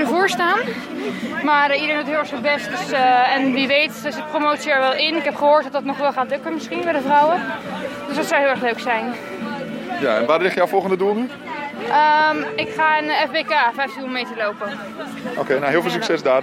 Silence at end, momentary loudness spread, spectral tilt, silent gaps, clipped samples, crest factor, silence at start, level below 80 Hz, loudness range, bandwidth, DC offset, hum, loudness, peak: 0 s; 11 LU; -4 dB/octave; none; under 0.1%; 16 dB; 0 s; -68 dBFS; 3 LU; 16 kHz; under 0.1%; none; -19 LUFS; -4 dBFS